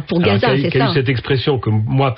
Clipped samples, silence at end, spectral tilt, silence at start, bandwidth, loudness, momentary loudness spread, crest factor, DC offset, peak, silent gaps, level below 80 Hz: under 0.1%; 0 s; -10.5 dB/octave; 0 s; 5.8 kHz; -16 LUFS; 3 LU; 10 dB; under 0.1%; -4 dBFS; none; -40 dBFS